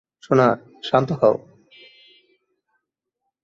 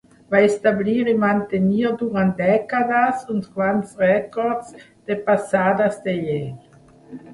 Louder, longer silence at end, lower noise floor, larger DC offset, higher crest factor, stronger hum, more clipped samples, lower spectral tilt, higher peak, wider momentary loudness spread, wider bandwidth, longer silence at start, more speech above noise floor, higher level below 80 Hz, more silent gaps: about the same, -20 LUFS vs -20 LUFS; first, 2.05 s vs 0 s; first, -80 dBFS vs -42 dBFS; neither; about the same, 20 dB vs 18 dB; neither; neither; about the same, -7.5 dB/octave vs -7 dB/octave; about the same, -2 dBFS vs -2 dBFS; about the same, 9 LU vs 8 LU; second, 7.6 kHz vs 11.5 kHz; about the same, 0.3 s vs 0.3 s; first, 62 dB vs 23 dB; about the same, -62 dBFS vs -58 dBFS; neither